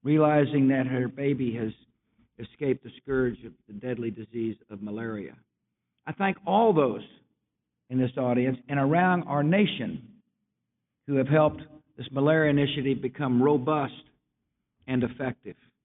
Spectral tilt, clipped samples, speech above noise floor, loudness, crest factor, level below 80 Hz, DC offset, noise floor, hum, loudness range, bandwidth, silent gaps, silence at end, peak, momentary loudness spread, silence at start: -6 dB/octave; under 0.1%; 57 dB; -26 LUFS; 18 dB; -62 dBFS; under 0.1%; -83 dBFS; none; 7 LU; 4 kHz; none; 0.35 s; -10 dBFS; 18 LU; 0.05 s